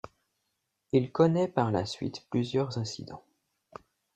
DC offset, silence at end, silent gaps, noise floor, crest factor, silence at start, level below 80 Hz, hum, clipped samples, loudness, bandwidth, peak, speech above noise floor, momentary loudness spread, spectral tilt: under 0.1%; 0.95 s; none; -81 dBFS; 22 dB; 0.95 s; -66 dBFS; none; under 0.1%; -29 LUFS; 9.2 kHz; -10 dBFS; 52 dB; 19 LU; -7 dB/octave